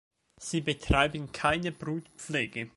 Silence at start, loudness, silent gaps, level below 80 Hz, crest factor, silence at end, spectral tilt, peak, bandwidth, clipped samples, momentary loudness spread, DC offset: 0.4 s; -30 LUFS; none; -44 dBFS; 22 dB; 0.1 s; -4.5 dB/octave; -8 dBFS; 11.5 kHz; under 0.1%; 11 LU; under 0.1%